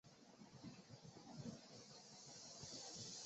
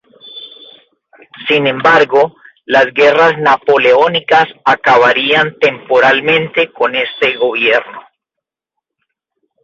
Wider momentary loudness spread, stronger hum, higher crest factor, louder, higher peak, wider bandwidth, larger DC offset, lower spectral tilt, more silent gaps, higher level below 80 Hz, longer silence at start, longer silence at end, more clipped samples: first, 10 LU vs 7 LU; neither; first, 18 dB vs 12 dB; second, -57 LUFS vs -10 LUFS; second, -40 dBFS vs 0 dBFS; about the same, 8 kHz vs 7.6 kHz; neither; about the same, -4 dB/octave vs -5 dB/octave; neither; second, -84 dBFS vs -58 dBFS; second, 0.05 s vs 0.25 s; second, 0 s vs 1.65 s; neither